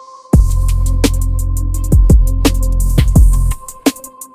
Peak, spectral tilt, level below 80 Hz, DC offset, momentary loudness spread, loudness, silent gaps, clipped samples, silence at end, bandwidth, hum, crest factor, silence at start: 0 dBFS; -6 dB/octave; -12 dBFS; under 0.1%; 8 LU; -14 LUFS; none; 0.2%; 0.1 s; 15.5 kHz; none; 12 dB; 0.15 s